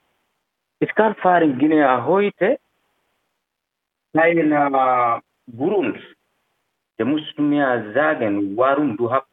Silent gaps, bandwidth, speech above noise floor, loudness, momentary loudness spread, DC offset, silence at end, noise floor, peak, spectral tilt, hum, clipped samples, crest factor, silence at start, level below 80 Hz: none; 3.9 kHz; 62 dB; -19 LUFS; 9 LU; under 0.1%; 0.1 s; -80 dBFS; -2 dBFS; -9 dB/octave; none; under 0.1%; 18 dB; 0.8 s; -70 dBFS